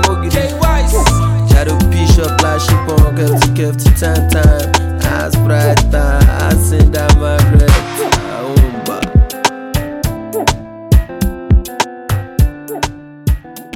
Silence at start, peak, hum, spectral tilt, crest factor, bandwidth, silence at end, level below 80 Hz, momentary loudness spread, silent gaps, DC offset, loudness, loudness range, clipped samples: 0 s; 0 dBFS; none; -5.5 dB/octave; 10 dB; 17 kHz; 0 s; -14 dBFS; 9 LU; none; under 0.1%; -13 LUFS; 5 LU; under 0.1%